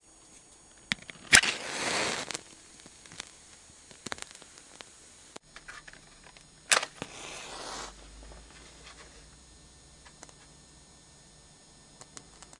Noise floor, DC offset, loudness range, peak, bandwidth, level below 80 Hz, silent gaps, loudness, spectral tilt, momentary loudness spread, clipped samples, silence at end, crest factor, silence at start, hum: -56 dBFS; under 0.1%; 24 LU; 0 dBFS; 12 kHz; -60 dBFS; none; -28 LUFS; 0 dB/octave; 26 LU; under 0.1%; 0.4 s; 36 dB; 0.9 s; none